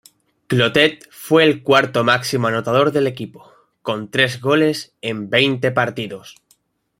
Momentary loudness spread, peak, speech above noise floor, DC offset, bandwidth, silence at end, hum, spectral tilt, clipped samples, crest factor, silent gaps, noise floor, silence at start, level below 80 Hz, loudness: 15 LU; 0 dBFS; 43 dB; under 0.1%; 16 kHz; 0.65 s; none; -5 dB/octave; under 0.1%; 18 dB; none; -61 dBFS; 0.5 s; -58 dBFS; -17 LUFS